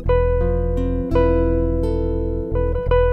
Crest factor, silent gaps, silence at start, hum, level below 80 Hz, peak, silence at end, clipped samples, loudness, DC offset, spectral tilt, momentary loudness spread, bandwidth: 14 dB; none; 0 s; none; -22 dBFS; -4 dBFS; 0 s; under 0.1%; -20 LUFS; under 0.1%; -10 dB/octave; 5 LU; 4.3 kHz